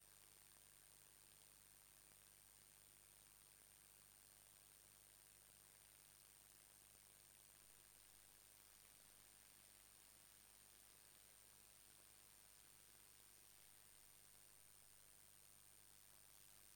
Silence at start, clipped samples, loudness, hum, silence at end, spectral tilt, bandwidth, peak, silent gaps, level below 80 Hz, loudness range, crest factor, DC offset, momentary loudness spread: 0 s; under 0.1%; -66 LUFS; 50 Hz at -85 dBFS; 0 s; -0.5 dB/octave; 18 kHz; -50 dBFS; none; -86 dBFS; 0 LU; 20 dB; under 0.1%; 0 LU